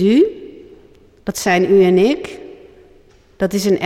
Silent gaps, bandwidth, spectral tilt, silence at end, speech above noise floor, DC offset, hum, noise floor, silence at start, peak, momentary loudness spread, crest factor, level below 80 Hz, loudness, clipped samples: none; 15.5 kHz; -5.5 dB/octave; 0 s; 35 dB; under 0.1%; none; -48 dBFS; 0 s; -4 dBFS; 22 LU; 14 dB; -50 dBFS; -15 LUFS; under 0.1%